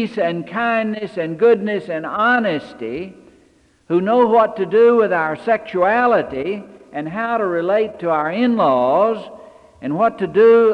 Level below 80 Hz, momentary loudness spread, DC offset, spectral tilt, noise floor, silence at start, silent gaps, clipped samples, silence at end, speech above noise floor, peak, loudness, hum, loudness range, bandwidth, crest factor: -60 dBFS; 14 LU; under 0.1%; -7.5 dB/octave; -54 dBFS; 0 s; none; under 0.1%; 0 s; 38 dB; -4 dBFS; -17 LUFS; none; 3 LU; 5.6 kHz; 14 dB